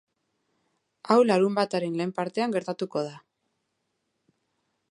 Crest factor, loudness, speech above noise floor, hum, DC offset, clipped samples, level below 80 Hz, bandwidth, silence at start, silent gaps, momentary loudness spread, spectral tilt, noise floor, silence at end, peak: 22 dB; -26 LUFS; 53 dB; none; under 0.1%; under 0.1%; -80 dBFS; 11.5 kHz; 1.05 s; none; 10 LU; -6 dB/octave; -78 dBFS; 1.75 s; -6 dBFS